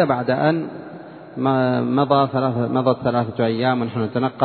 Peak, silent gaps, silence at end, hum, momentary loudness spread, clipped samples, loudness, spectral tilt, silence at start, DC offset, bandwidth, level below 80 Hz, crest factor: -2 dBFS; none; 0 s; none; 14 LU; under 0.1%; -20 LUFS; -11 dB/octave; 0 s; under 0.1%; 4.5 kHz; -60 dBFS; 18 dB